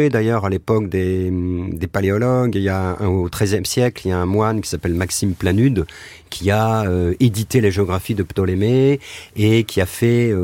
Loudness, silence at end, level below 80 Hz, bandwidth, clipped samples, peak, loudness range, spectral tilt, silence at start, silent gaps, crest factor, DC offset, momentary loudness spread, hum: -18 LUFS; 0 s; -40 dBFS; 17 kHz; under 0.1%; -2 dBFS; 2 LU; -6 dB/octave; 0 s; none; 14 dB; under 0.1%; 6 LU; none